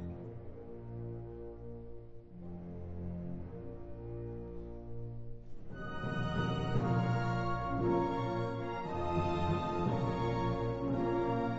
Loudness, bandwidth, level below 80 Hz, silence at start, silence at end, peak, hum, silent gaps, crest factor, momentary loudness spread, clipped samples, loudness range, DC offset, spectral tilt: -37 LUFS; 7.6 kHz; -50 dBFS; 0 s; 0 s; -20 dBFS; none; none; 16 dB; 16 LU; under 0.1%; 12 LU; under 0.1%; -7 dB/octave